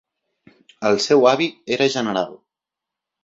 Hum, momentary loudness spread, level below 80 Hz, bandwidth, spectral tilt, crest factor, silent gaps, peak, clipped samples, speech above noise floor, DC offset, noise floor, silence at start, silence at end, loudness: none; 10 LU; -66 dBFS; 7.8 kHz; -4 dB/octave; 18 dB; none; -2 dBFS; under 0.1%; 68 dB; under 0.1%; -86 dBFS; 0.8 s; 0.9 s; -19 LUFS